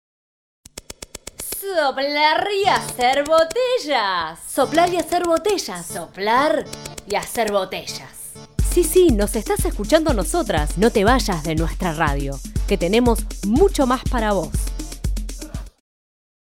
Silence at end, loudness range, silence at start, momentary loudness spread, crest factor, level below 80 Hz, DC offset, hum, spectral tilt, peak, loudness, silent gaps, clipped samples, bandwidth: 0.8 s; 3 LU; 0.75 s; 15 LU; 18 dB; -30 dBFS; 0.1%; none; -4.5 dB/octave; -2 dBFS; -20 LUFS; none; under 0.1%; 17 kHz